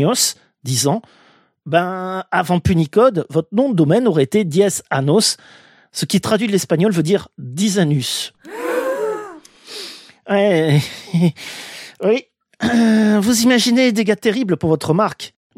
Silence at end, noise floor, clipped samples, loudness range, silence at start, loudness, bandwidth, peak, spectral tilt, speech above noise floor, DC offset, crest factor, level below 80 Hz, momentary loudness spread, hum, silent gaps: 0.3 s; -37 dBFS; under 0.1%; 4 LU; 0 s; -17 LUFS; 16 kHz; 0 dBFS; -5 dB/octave; 21 dB; under 0.1%; 16 dB; -50 dBFS; 15 LU; none; none